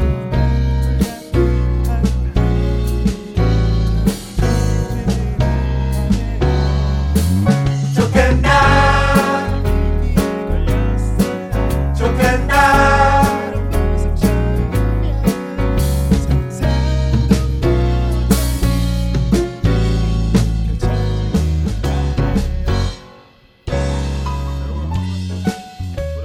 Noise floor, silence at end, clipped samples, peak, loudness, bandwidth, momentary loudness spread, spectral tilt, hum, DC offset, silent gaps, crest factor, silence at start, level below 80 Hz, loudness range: -47 dBFS; 0 s; under 0.1%; 0 dBFS; -17 LUFS; 17 kHz; 8 LU; -6.5 dB/octave; none; under 0.1%; none; 16 dB; 0 s; -20 dBFS; 6 LU